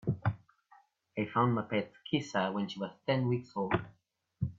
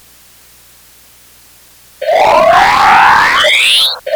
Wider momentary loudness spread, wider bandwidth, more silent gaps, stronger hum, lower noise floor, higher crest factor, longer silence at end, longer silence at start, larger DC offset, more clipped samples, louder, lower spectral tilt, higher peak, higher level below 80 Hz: first, 9 LU vs 5 LU; second, 7.6 kHz vs over 20 kHz; neither; second, none vs 60 Hz at -50 dBFS; first, -65 dBFS vs -42 dBFS; first, 20 dB vs 10 dB; about the same, 0.05 s vs 0 s; second, 0.05 s vs 2 s; neither; second, under 0.1% vs 0.6%; second, -34 LUFS vs -7 LUFS; first, -7 dB/octave vs -1 dB/octave; second, -16 dBFS vs 0 dBFS; second, -64 dBFS vs -42 dBFS